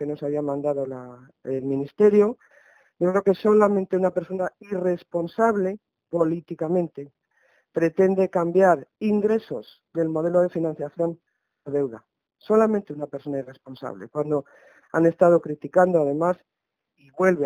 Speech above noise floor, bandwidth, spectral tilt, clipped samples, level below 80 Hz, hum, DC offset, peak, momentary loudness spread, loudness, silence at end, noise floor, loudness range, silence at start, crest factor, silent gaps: 47 dB; 10 kHz; -8.5 dB/octave; under 0.1%; -68 dBFS; none; under 0.1%; -4 dBFS; 14 LU; -23 LUFS; 0 s; -70 dBFS; 5 LU; 0 s; 20 dB; none